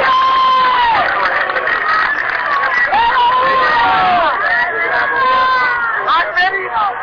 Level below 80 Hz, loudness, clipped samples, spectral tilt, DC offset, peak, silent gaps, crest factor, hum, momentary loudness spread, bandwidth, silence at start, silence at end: -46 dBFS; -12 LUFS; under 0.1%; -3.5 dB/octave; under 0.1%; -6 dBFS; none; 8 dB; none; 3 LU; 5.4 kHz; 0 s; 0 s